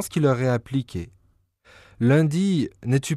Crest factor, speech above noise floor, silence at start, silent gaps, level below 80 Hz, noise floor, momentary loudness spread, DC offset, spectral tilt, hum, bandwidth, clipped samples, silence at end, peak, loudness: 14 dB; 41 dB; 0 s; none; -54 dBFS; -63 dBFS; 14 LU; under 0.1%; -7 dB/octave; none; 13 kHz; under 0.1%; 0 s; -8 dBFS; -22 LUFS